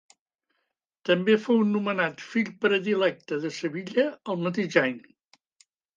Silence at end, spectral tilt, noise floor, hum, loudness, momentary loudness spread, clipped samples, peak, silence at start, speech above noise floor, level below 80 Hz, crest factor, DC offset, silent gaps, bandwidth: 1 s; -6 dB/octave; -80 dBFS; none; -26 LUFS; 9 LU; under 0.1%; -6 dBFS; 1.05 s; 54 dB; -78 dBFS; 20 dB; under 0.1%; none; 7.6 kHz